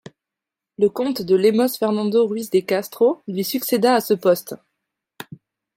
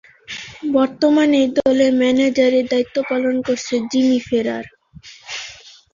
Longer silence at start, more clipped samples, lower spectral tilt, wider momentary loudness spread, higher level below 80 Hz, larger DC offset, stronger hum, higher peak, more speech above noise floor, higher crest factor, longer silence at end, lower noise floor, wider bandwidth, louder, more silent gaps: first, 0.8 s vs 0.3 s; neither; about the same, -5 dB/octave vs -4 dB/octave; first, 20 LU vs 16 LU; second, -70 dBFS vs -56 dBFS; neither; neither; about the same, -4 dBFS vs -4 dBFS; first, 67 dB vs 26 dB; about the same, 16 dB vs 14 dB; about the same, 0.4 s vs 0.4 s; first, -86 dBFS vs -43 dBFS; first, 16.5 kHz vs 7.4 kHz; about the same, -19 LUFS vs -17 LUFS; neither